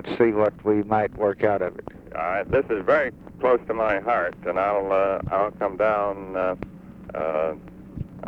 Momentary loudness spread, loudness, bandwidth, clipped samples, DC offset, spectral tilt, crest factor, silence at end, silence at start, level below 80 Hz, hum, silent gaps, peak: 14 LU; -24 LUFS; 6 kHz; under 0.1%; under 0.1%; -8.5 dB/octave; 18 dB; 0 s; 0 s; -50 dBFS; none; none; -6 dBFS